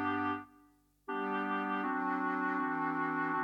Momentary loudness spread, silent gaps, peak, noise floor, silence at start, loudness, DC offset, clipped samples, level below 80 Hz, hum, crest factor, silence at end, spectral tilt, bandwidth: 6 LU; none; -24 dBFS; -67 dBFS; 0 s; -35 LUFS; under 0.1%; under 0.1%; -78 dBFS; 50 Hz at -75 dBFS; 12 dB; 0 s; -7.5 dB/octave; 6 kHz